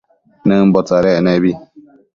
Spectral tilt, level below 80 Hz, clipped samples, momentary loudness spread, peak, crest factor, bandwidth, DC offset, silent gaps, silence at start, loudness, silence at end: -8 dB/octave; -48 dBFS; under 0.1%; 7 LU; 0 dBFS; 14 dB; 7.2 kHz; under 0.1%; none; 0.45 s; -13 LUFS; 0.55 s